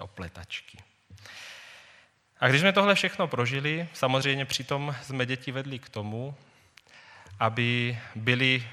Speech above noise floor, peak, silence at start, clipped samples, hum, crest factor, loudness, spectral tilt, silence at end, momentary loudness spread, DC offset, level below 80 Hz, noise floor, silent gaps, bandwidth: 32 dB; -6 dBFS; 0 s; under 0.1%; none; 24 dB; -27 LUFS; -5 dB/octave; 0 s; 20 LU; under 0.1%; -64 dBFS; -59 dBFS; none; 15 kHz